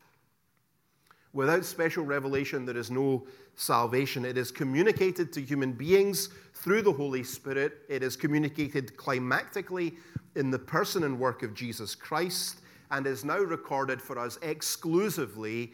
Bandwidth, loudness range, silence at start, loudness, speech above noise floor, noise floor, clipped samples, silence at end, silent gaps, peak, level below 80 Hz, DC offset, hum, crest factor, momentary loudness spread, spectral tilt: 18.5 kHz; 4 LU; 1.35 s; -30 LUFS; 43 dB; -73 dBFS; under 0.1%; 0.05 s; none; -10 dBFS; -70 dBFS; under 0.1%; none; 20 dB; 10 LU; -4.5 dB/octave